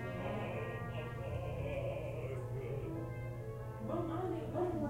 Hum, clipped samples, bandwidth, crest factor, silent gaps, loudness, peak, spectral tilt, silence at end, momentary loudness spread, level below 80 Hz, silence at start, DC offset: none; under 0.1%; 15.5 kHz; 16 dB; none; -41 LUFS; -26 dBFS; -8 dB/octave; 0 s; 5 LU; -54 dBFS; 0 s; under 0.1%